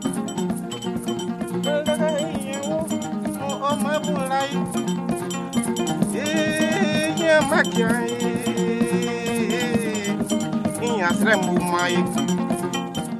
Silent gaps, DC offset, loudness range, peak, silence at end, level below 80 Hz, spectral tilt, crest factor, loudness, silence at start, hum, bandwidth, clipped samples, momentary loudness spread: none; under 0.1%; 4 LU; -4 dBFS; 0 s; -54 dBFS; -4.5 dB/octave; 18 dB; -22 LUFS; 0 s; none; 14 kHz; under 0.1%; 8 LU